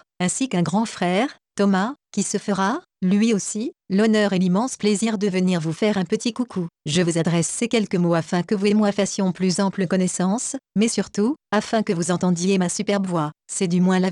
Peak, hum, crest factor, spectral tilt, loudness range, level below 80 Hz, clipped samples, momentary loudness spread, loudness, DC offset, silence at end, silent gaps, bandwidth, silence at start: -10 dBFS; none; 12 dB; -5 dB/octave; 1 LU; -64 dBFS; under 0.1%; 6 LU; -22 LUFS; under 0.1%; 0 s; none; 11.5 kHz; 0.2 s